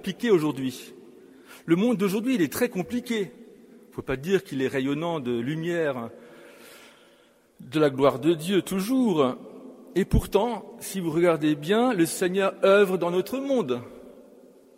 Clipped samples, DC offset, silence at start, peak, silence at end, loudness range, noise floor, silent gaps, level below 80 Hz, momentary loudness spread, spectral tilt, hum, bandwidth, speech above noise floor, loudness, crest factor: under 0.1%; under 0.1%; 0.05 s; -6 dBFS; 0.55 s; 6 LU; -59 dBFS; none; -44 dBFS; 13 LU; -5.5 dB/octave; none; 16 kHz; 35 dB; -25 LUFS; 20 dB